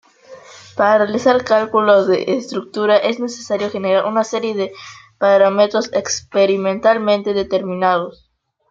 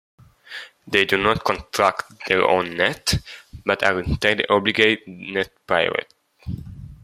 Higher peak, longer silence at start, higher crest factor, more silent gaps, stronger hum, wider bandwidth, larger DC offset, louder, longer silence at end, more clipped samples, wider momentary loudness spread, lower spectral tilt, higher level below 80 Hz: about the same, -2 dBFS vs -2 dBFS; second, 0.3 s vs 0.5 s; about the same, 16 dB vs 20 dB; neither; neither; second, 7.6 kHz vs 16 kHz; neither; first, -16 LUFS vs -20 LUFS; first, 0.6 s vs 0.1 s; neither; second, 10 LU vs 18 LU; about the same, -4.5 dB/octave vs -4 dB/octave; second, -60 dBFS vs -42 dBFS